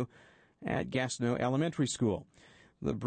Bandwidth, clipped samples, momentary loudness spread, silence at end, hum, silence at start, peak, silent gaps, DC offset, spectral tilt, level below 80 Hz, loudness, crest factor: 9.4 kHz; under 0.1%; 9 LU; 0 s; none; 0 s; -18 dBFS; none; under 0.1%; -5.5 dB/octave; -60 dBFS; -33 LUFS; 16 dB